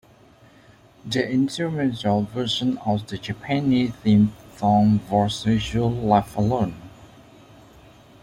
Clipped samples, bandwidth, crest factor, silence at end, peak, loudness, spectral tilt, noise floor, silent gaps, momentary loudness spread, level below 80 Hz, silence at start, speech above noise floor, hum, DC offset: under 0.1%; 11.5 kHz; 20 dB; 1.2 s; -4 dBFS; -22 LUFS; -6.5 dB/octave; -52 dBFS; none; 8 LU; -48 dBFS; 1.05 s; 31 dB; none; under 0.1%